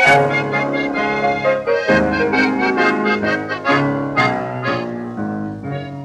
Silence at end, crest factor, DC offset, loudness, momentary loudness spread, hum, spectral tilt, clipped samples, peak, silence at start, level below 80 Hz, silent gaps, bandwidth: 0 s; 16 dB; under 0.1%; -17 LUFS; 10 LU; none; -6 dB/octave; under 0.1%; -2 dBFS; 0 s; -48 dBFS; none; 12.5 kHz